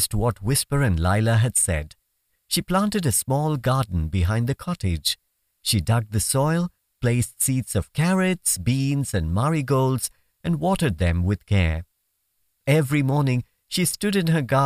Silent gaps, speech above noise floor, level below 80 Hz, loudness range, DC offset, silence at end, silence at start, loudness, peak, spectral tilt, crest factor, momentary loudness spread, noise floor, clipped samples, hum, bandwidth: none; 51 dB; -38 dBFS; 2 LU; under 0.1%; 0 s; 0 s; -23 LUFS; -6 dBFS; -5 dB/octave; 16 dB; 7 LU; -73 dBFS; under 0.1%; none; 16 kHz